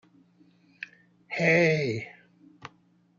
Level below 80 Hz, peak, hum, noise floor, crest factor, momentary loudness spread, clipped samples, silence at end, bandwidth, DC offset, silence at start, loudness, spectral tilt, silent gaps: -72 dBFS; -10 dBFS; none; -63 dBFS; 20 dB; 27 LU; under 0.1%; 0.5 s; 7.4 kHz; under 0.1%; 0.8 s; -25 LUFS; -6 dB/octave; none